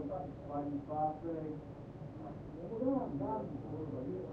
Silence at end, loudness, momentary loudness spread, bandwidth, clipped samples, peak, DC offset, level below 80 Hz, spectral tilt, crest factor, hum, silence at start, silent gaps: 0 s; -41 LUFS; 11 LU; 5.6 kHz; under 0.1%; -22 dBFS; under 0.1%; -60 dBFS; -10.5 dB/octave; 18 dB; none; 0 s; none